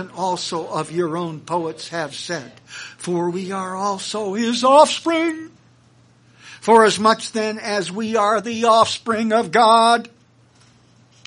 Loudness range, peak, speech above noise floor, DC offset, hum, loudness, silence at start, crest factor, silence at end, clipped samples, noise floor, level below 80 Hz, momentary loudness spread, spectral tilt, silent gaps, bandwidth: 8 LU; 0 dBFS; 35 dB; under 0.1%; none; -18 LUFS; 0 s; 20 dB; 1.2 s; under 0.1%; -53 dBFS; -68 dBFS; 14 LU; -4 dB/octave; none; 10.5 kHz